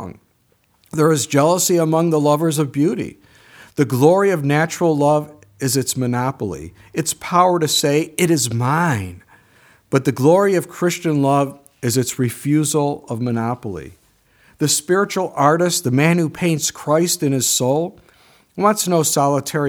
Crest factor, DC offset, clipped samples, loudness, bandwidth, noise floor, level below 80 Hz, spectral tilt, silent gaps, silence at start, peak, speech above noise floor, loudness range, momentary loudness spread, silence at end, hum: 18 dB; under 0.1%; under 0.1%; -17 LUFS; over 20 kHz; -61 dBFS; -56 dBFS; -4.5 dB/octave; none; 0 s; 0 dBFS; 44 dB; 3 LU; 11 LU; 0 s; none